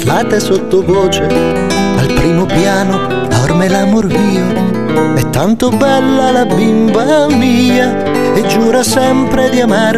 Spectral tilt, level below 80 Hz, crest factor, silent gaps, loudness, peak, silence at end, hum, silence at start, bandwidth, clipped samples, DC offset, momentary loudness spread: -5.5 dB/octave; -32 dBFS; 10 dB; none; -11 LUFS; 0 dBFS; 0 s; none; 0 s; 14 kHz; under 0.1%; 4%; 3 LU